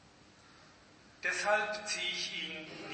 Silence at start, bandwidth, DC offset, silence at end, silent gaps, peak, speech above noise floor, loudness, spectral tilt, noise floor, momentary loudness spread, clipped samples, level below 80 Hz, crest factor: 0.05 s; 8.8 kHz; under 0.1%; 0 s; none; -18 dBFS; 24 dB; -34 LUFS; -1 dB/octave; -60 dBFS; 9 LU; under 0.1%; -74 dBFS; 20 dB